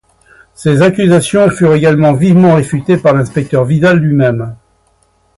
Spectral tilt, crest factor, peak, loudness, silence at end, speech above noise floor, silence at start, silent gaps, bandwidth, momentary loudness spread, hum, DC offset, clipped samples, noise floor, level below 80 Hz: -7 dB/octave; 10 dB; 0 dBFS; -10 LUFS; 0.85 s; 45 dB; 0.6 s; none; 11.5 kHz; 6 LU; none; under 0.1%; under 0.1%; -54 dBFS; -42 dBFS